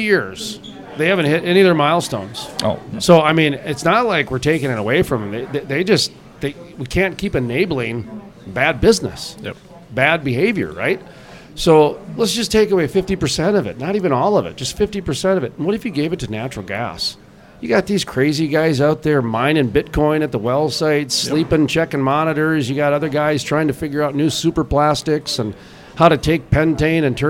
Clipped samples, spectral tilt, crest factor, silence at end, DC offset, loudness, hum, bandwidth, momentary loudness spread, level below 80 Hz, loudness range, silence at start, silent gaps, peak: under 0.1%; -5 dB/octave; 18 dB; 0 s; under 0.1%; -17 LUFS; none; 16.5 kHz; 12 LU; -40 dBFS; 4 LU; 0 s; none; 0 dBFS